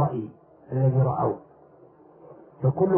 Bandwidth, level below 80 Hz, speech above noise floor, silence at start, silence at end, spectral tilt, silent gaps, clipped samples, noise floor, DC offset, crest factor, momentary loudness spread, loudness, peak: 2.3 kHz; -58 dBFS; 31 dB; 0 s; 0 s; -14.5 dB/octave; none; under 0.1%; -53 dBFS; under 0.1%; 16 dB; 14 LU; -26 LUFS; -10 dBFS